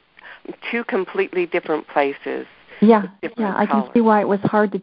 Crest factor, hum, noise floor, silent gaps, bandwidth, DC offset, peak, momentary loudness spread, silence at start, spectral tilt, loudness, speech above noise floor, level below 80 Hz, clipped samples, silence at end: 18 dB; none; -40 dBFS; none; 5.2 kHz; under 0.1%; 0 dBFS; 15 LU; 0.25 s; -11.5 dB/octave; -19 LUFS; 21 dB; -66 dBFS; under 0.1%; 0 s